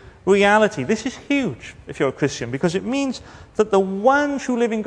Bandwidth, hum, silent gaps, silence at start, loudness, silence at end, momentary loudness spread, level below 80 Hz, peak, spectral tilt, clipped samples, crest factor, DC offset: 10 kHz; none; none; 0.05 s; -20 LUFS; 0 s; 12 LU; -50 dBFS; -2 dBFS; -5 dB/octave; under 0.1%; 18 dB; under 0.1%